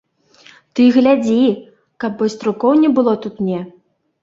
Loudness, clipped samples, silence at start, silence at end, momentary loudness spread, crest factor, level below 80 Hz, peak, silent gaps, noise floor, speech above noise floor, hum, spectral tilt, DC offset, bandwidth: -15 LUFS; under 0.1%; 0.75 s; 0.55 s; 14 LU; 16 dB; -60 dBFS; -2 dBFS; none; -48 dBFS; 34 dB; none; -7 dB/octave; under 0.1%; 7.6 kHz